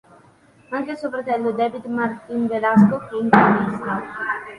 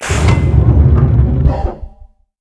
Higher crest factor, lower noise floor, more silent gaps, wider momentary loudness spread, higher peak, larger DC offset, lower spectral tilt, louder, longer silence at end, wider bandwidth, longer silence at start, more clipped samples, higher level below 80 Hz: first, 20 dB vs 12 dB; first, -52 dBFS vs -41 dBFS; neither; about the same, 12 LU vs 11 LU; about the same, 0 dBFS vs 0 dBFS; neither; first, -8.5 dB/octave vs -7 dB/octave; second, -20 LUFS vs -12 LUFS; second, 0 s vs 0.55 s; second, 9.8 kHz vs 11 kHz; first, 0.7 s vs 0 s; neither; second, -58 dBFS vs -16 dBFS